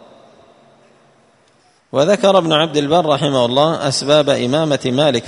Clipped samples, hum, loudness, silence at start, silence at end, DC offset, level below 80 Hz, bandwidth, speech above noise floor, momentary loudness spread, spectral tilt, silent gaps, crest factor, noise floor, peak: under 0.1%; none; -14 LUFS; 1.95 s; 0 s; under 0.1%; -56 dBFS; 11 kHz; 40 dB; 4 LU; -5 dB/octave; none; 16 dB; -54 dBFS; 0 dBFS